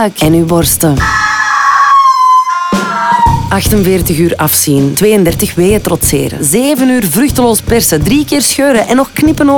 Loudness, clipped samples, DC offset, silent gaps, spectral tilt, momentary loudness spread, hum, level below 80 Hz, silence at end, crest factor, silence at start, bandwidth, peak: -9 LUFS; under 0.1%; under 0.1%; none; -4.5 dB/octave; 4 LU; none; -28 dBFS; 0 s; 8 dB; 0 s; over 20 kHz; 0 dBFS